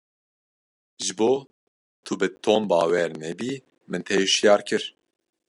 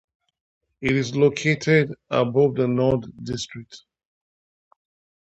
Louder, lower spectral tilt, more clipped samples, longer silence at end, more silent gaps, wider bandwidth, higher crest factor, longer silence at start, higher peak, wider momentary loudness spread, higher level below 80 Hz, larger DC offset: about the same, -23 LUFS vs -22 LUFS; second, -3 dB/octave vs -6 dB/octave; neither; second, 0.65 s vs 1.45 s; first, 1.51-2.03 s vs none; first, 11.5 kHz vs 8.2 kHz; about the same, 20 dB vs 18 dB; first, 1 s vs 0.8 s; about the same, -4 dBFS vs -6 dBFS; first, 15 LU vs 12 LU; second, -74 dBFS vs -54 dBFS; neither